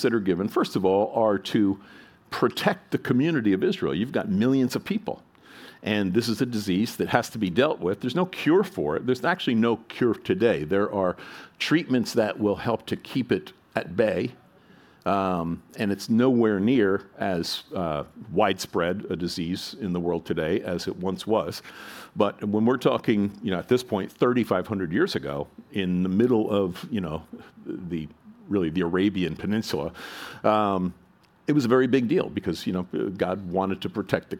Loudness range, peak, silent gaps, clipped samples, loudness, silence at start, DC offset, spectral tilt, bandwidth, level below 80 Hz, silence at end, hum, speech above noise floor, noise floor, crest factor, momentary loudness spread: 3 LU; -2 dBFS; none; under 0.1%; -25 LUFS; 0 s; under 0.1%; -6 dB/octave; 17.5 kHz; -58 dBFS; 0 s; none; 29 dB; -54 dBFS; 24 dB; 11 LU